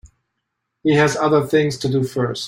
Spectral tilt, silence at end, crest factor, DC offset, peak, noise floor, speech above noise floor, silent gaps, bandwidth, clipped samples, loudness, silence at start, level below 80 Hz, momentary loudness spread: -5.5 dB/octave; 0 s; 18 dB; under 0.1%; -2 dBFS; -76 dBFS; 59 dB; none; 16.5 kHz; under 0.1%; -18 LUFS; 0.05 s; -54 dBFS; 6 LU